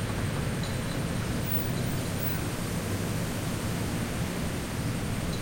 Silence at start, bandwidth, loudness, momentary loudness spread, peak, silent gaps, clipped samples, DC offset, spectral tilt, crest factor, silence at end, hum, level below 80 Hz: 0 s; 16.5 kHz; -31 LUFS; 3 LU; -16 dBFS; none; under 0.1%; under 0.1%; -5 dB/octave; 14 dB; 0 s; none; -42 dBFS